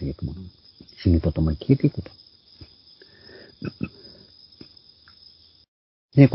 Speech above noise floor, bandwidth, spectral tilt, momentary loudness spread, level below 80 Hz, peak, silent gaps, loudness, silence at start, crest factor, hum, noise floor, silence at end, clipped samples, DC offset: 29 dB; 5.8 kHz; -12.5 dB/octave; 26 LU; -36 dBFS; 0 dBFS; 5.68-6.09 s; -24 LUFS; 0 s; 24 dB; none; -53 dBFS; 0 s; under 0.1%; under 0.1%